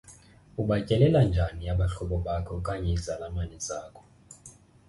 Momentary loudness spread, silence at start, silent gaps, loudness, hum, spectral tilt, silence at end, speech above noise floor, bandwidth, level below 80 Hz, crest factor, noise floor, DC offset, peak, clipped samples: 20 LU; 0.1 s; none; -28 LUFS; none; -6.5 dB/octave; 0.35 s; 26 dB; 11.5 kHz; -38 dBFS; 20 dB; -53 dBFS; under 0.1%; -8 dBFS; under 0.1%